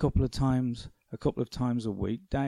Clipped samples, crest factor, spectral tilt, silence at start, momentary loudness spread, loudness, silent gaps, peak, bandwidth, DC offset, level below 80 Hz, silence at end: under 0.1%; 14 dB; -7.5 dB/octave; 0 s; 7 LU; -31 LUFS; none; -16 dBFS; 12 kHz; under 0.1%; -42 dBFS; 0 s